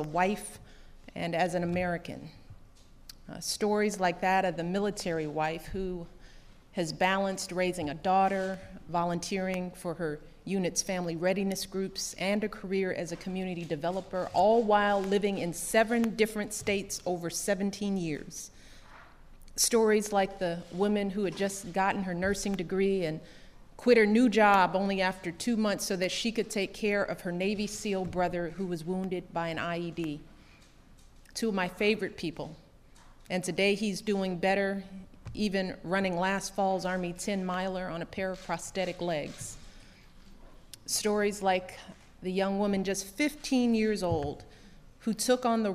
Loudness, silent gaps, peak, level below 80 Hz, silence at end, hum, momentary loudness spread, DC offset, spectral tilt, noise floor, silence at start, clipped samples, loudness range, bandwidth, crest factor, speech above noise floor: -30 LUFS; none; -10 dBFS; -54 dBFS; 0 s; none; 12 LU; under 0.1%; -4.5 dB/octave; -56 dBFS; 0 s; under 0.1%; 7 LU; 15.5 kHz; 20 dB; 26 dB